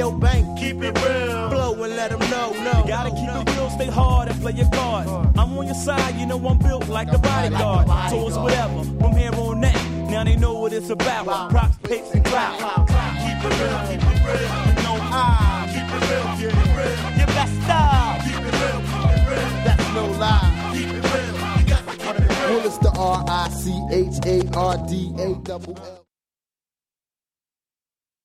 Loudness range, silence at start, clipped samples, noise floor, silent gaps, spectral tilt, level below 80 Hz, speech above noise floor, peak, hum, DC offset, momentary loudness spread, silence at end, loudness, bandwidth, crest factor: 3 LU; 0 s; under 0.1%; under -90 dBFS; none; -6 dB/octave; -24 dBFS; over 71 dB; -4 dBFS; none; under 0.1%; 6 LU; 2.3 s; -20 LUFS; 14.5 kHz; 16 dB